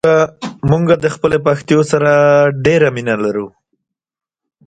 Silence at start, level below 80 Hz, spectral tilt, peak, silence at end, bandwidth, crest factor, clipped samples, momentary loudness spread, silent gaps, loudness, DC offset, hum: 0.05 s; -46 dBFS; -6.5 dB/octave; 0 dBFS; 1.2 s; 9.2 kHz; 14 dB; under 0.1%; 9 LU; none; -13 LUFS; under 0.1%; none